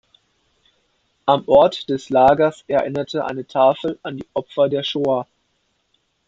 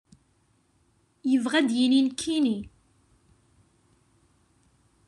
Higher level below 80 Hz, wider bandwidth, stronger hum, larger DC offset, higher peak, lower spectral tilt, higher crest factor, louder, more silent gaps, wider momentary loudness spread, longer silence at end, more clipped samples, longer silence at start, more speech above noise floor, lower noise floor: first, -56 dBFS vs -64 dBFS; second, 7.8 kHz vs 11 kHz; neither; neither; first, -2 dBFS vs -10 dBFS; first, -6 dB/octave vs -3.5 dB/octave; about the same, 18 dB vs 20 dB; first, -18 LUFS vs -25 LUFS; neither; about the same, 12 LU vs 12 LU; second, 1.05 s vs 2.4 s; neither; about the same, 1.25 s vs 1.25 s; first, 50 dB vs 43 dB; about the same, -68 dBFS vs -67 dBFS